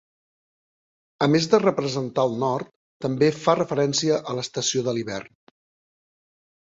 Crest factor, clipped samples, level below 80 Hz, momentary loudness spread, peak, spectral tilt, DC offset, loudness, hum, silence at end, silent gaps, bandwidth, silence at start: 22 dB; under 0.1%; -64 dBFS; 11 LU; -4 dBFS; -4.5 dB/octave; under 0.1%; -23 LUFS; none; 1.45 s; 2.76-3.00 s; 7.8 kHz; 1.2 s